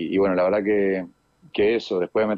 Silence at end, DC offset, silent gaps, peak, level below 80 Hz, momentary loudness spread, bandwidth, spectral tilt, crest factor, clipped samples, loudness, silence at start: 0 s; under 0.1%; none; -12 dBFS; -58 dBFS; 10 LU; 7.2 kHz; -7 dB/octave; 10 dB; under 0.1%; -22 LUFS; 0 s